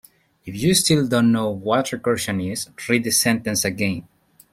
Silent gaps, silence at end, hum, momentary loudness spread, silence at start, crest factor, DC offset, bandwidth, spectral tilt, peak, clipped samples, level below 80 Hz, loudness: none; 0.5 s; none; 9 LU; 0.45 s; 18 dB; under 0.1%; 16.5 kHz; -4 dB/octave; -4 dBFS; under 0.1%; -52 dBFS; -20 LUFS